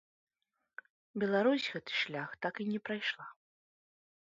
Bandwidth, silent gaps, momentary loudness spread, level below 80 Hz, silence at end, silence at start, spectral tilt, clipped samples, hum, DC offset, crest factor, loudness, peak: 7.6 kHz; none; 23 LU; -82 dBFS; 1 s; 1.15 s; -2.5 dB/octave; under 0.1%; none; under 0.1%; 20 dB; -35 LUFS; -18 dBFS